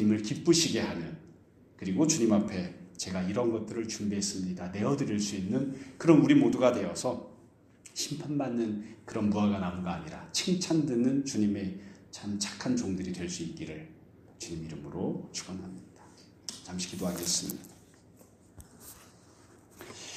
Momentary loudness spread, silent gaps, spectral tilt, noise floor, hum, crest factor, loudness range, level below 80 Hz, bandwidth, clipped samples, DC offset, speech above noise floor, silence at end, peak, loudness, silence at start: 18 LU; none; -5 dB/octave; -58 dBFS; none; 24 dB; 10 LU; -64 dBFS; 15.5 kHz; under 0.1%; under 0.1%; 28 dB; 0 s; -8 dBFS; -30 LUFS; 0 s